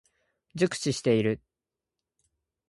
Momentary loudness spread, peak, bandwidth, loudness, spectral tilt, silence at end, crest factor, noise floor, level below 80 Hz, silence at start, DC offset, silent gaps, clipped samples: 11 LU; -12 dBFS; 11.5 kHz; -28 LUFS; -5.5 dB/octave; 1.3 s; 20 dB; -89 dBFS; -64 dBFS; 0.55 s; under 0.1%; none; under 0.1%